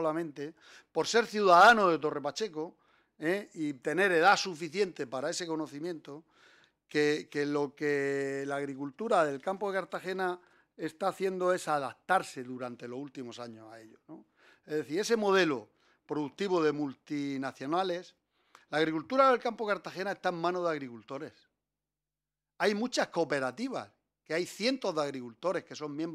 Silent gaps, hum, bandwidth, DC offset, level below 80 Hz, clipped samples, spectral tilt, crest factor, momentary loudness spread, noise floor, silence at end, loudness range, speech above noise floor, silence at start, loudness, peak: none; none; 15 kHz; under 0.1%; -78 dBFS; under 0.1%; -4 dB/octave; 22 dB; 16 LU; under -90 dBFS; 0 s; 8 LU; over 59 dB; 0 s; -31 LUFS; -10 dBFS